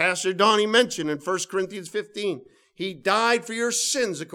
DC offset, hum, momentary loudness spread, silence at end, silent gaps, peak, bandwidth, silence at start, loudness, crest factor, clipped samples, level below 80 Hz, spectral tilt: under 0.1%; none; 12 LU; 0.05 s; none; -4 dBFS; 17.5 kHz; 0 s; -23 LUFS; 20 dB; under 0.1%; -72 dBFS; -2 dB/octave